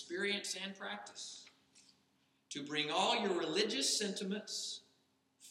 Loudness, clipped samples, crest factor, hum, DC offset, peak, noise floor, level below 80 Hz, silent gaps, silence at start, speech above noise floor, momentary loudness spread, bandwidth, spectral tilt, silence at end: -37 LUFS; under 0.1%; 22 dB; none; under 0.1%; -18 dBFS; -76 dBFS; under -90 dBFS; none; 0 s; 38 dB; 15 LU; 16.5 kHz; -2 dB/octave; 0 s